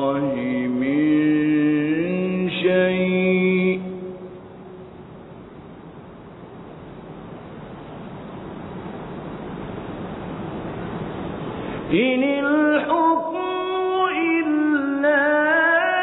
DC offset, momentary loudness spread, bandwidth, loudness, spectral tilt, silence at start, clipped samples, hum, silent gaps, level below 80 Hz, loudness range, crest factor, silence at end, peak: under 0.1%; 22 LU; 4.1 kHz; -21 LUFS; -10.5 dB/octave; 0 s; under 0.1%; none; none; -52 dBFS; 19 LU; 16 dB; 0 s; -6 dBFS